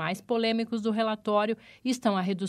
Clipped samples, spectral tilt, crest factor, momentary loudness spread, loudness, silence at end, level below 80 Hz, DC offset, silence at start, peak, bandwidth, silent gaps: under 0.1%; -5.5 dB/octave; 16 dB; 5 LU; -28 LUFS; 0 s; -74 dBFS; under 0.1%; 0 s; -12 dBFS; 14 kHz; none